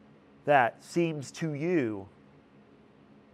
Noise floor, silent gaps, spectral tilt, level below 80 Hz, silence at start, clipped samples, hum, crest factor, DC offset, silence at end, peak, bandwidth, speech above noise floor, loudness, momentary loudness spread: -58 dBFS; none; -6 dB/octave; -76 dBFS; 0.45 s; under 0.1%; none; 22 dB; under 0.1%; 1.25 s; -8 dBFS; 12.5 kHz; 29 dB; -29 LUFS; 11 LU